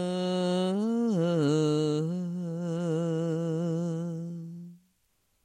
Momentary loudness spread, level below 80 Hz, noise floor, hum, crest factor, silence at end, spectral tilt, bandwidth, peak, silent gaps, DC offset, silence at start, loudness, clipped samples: 12 LU; -76 dBFS; -72 dBFS; none; 14 dB; 0.7 s; -7.5 dB/octave; 10.5 kHz; -14 dBFS; none; under 0.1%; 0 s; -29 LUFS; under 0.1%